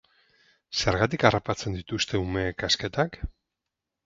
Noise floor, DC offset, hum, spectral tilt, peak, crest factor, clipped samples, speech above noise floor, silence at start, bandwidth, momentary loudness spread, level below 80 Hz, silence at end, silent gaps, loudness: -86 dBFS; under 0.1%; none; -4.5 dB/octave; 0 dBFS; 28 dB; under 0.1%; 59 dB; 0.7 s; 7.8 kHz; 10 LU; -44 dBFS; 0.75 s; none; -26 LUFS